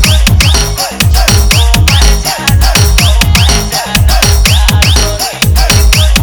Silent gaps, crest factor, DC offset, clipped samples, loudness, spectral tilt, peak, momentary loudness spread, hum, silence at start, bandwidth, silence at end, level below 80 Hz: none; 6 dB; under 0.1%; 2%; -7 LUFS; -3.5 dB/octave; 0 dBFS; 4 LU; none; 0 s; over 20 kHz; 0 s; -10 dBFS